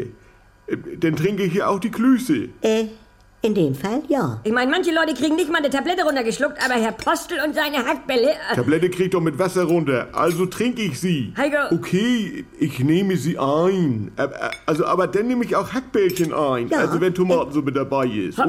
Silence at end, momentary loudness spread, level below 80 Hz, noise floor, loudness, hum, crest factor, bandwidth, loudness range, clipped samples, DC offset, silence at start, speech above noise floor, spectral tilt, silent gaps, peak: 0 s; 5 LU; -52 dBFS; -51 dBFS; -21 LUFS; none; 14 dB; 16.5 kHz; 1 LU; under 0.1%; under 0.1%; 0 s; 31 dB; -5.5 dB/octave; none; -8 dBFS